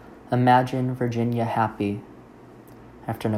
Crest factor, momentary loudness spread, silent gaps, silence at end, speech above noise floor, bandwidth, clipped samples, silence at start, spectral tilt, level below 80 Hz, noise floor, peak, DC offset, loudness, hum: 20 dB; 14 LU; none; 0 s; 24 dB; 15.5 kHz; under 0.1%; 0 s; -8 dB/octave; -58 dBFS; -47 dBFS; -4 dBFS; under 0.1%; -23 LUFS; none